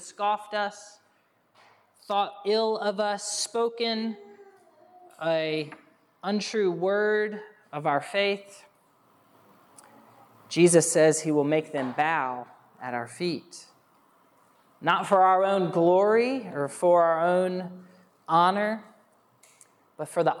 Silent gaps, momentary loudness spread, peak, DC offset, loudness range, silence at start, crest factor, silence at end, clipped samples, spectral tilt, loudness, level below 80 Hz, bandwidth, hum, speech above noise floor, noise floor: none; 14 LU; -8 dBFS; under 0.1%; 7 LU; 0 s; 20 dB; 0 s; under 0.1%; -4 dB/octave; -25 LUFS; -88 dBFS; 13.5 kHz; none; 42 dB; -67 dBFS